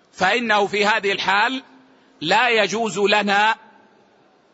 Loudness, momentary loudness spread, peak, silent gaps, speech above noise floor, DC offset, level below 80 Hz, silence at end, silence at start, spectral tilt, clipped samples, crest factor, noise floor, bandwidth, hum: -18 LUFS; 6 LU; -4 dBFS; none; 37 dB; under 0.1%; -66 dBFS; 1 s; 0.2 s; -3 dB/octave; under 0.1%; 18 dB; -56 dBFS; 8 kHz; none